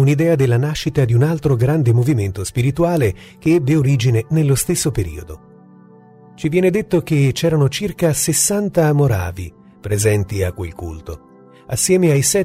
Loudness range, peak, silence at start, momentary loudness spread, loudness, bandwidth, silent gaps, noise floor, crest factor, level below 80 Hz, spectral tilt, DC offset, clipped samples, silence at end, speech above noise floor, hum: 3 LU; -4 dBFS; 0 s; 13 LU; -17 LUFS; 16 kHz; none; -44 dBFS; 14 dB; -40 dBFS; -5.5 dB/octave; under 0.1%; under 0.1%; 0 s; 28 dB; none